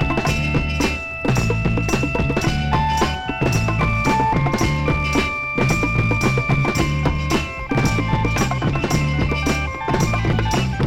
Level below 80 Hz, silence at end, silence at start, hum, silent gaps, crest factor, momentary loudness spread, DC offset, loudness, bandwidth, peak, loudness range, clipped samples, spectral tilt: -28 dBFS; 0 s; 0 s; none; none; 14 dB; 3 LU; under 0.1%; -19 LUFS; 16.5 kHz; -4 dBFS; 1 LU; under 0.1%; -5.5 dB/octave